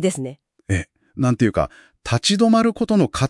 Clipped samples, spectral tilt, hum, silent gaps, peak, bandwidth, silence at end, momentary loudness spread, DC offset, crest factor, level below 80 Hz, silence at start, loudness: under 0.1%; -5.5 dB/octave; none; none; -4 dBFS; 12 kHz; 0 s; 15 LU; under 0.1%; 16 dB; -46 dBFS; 0 s; -19 LUFS